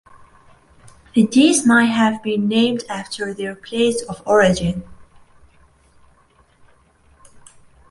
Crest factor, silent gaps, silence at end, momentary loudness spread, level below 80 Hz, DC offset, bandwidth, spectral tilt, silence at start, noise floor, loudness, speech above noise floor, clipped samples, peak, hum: 18 dB; none; 2.9 s; 13 LU; -48 dBFS; under 0.1%; 11.5 kHz; -4.5 dB/octave; 1.15 s; -55 dBFS; -17 LUFS; 38 dB; under 0.1%; -2 dBFS; none